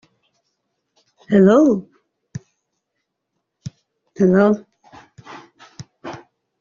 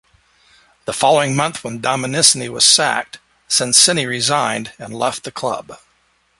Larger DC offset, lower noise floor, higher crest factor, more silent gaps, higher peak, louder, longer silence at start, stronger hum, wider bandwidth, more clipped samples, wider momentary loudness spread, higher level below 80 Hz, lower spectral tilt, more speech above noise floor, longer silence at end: neither; first, -77 dBFS vs -60 dBFS; about the same, 18 dB vs 18 dB; neither; about the same, -2 dBFS vs 0 dBFS; about the same, -15 LUFS vs -15 LUFS; first, 1.3 s vs 0.85 s; neither; second, 7.4 kHz vs 16 kHz; neither; first, 27 LU vs 15 LU; about the same, -60 dBFS vs -58 dBFS; first, -8 dB/octave vs -1.5 dB/octave; first, 63 dB vs 43 dB; second, 0.45 s vs 0.65 s